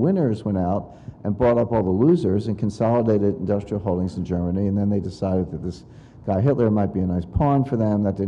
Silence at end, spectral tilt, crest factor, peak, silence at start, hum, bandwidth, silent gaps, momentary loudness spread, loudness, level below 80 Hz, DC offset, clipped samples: 0 s; -10 dB/octave; 14 dB; -8 dBFS; 0 s; none; 9.2 kHz; none; 9 LU; -22 LUFS; -44 dBFS; under 0.1%; under 0.1%